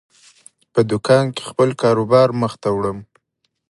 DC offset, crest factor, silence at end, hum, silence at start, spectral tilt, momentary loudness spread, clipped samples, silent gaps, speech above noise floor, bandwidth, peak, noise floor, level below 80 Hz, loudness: under 0.1%; 18 dB; 0.65 s; none; 0.75 s; -6.5 dB/octave; 8 LU; under 0.1%; none; 55 dB; 11.5 kHz; 0 dBFS; -71 dBFS; -54 dBFS; -17 LUFS